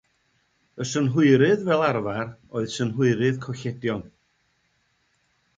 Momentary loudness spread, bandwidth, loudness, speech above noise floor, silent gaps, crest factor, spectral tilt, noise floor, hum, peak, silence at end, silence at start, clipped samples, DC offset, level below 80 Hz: 13 LU; 9.2 kHz; -23 LUFS; 46 dB; none; 20 dB; -6.5 dB/octave; -69 dBFS; none; -6 dBFS; 1.5 s; 0.75 s; under 0.1%; under 0.1%; -60 dBFS